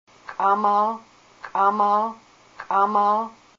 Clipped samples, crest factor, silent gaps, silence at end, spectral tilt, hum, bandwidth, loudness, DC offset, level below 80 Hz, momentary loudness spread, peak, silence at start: under 0.1%; 14 dB; none; 0.25 s; -6 dB/octave; none; 7.4 kHz; -21 LUFS; under 0.1%; -70 dBFS; 17 LU; -8 dBFS; 0.3 s